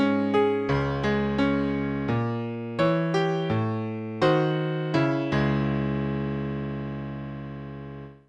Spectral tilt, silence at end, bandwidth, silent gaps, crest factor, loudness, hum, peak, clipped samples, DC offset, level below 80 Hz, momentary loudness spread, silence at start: -8 dB/octave; 0.15 s; 8.6 kHz; none; 16 dB; -26 LUFS; none; -10 dBFS; under 0.1%; under 0.1%; -46 dBFS; 12 LU; 0 s